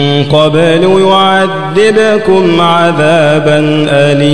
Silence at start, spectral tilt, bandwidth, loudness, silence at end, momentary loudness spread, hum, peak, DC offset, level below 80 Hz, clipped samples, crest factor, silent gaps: 0 s; -6 dB/octave; 11 kHz; -7 LUFS; 0 s; 2 LU; none; 0 dBFS; 3%; -40 dBFS; 3%; 8 dB; none